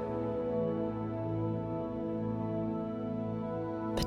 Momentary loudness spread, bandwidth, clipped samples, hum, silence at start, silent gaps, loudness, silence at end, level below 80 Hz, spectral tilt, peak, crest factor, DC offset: 3 LU; 12.5 kHz; under 0.1%; none; 0 s; none; -35 LUFS; 0 s; -54 dBFS; -7.5 dB/octave; -20 dBFS; 14 dB; under 0.1%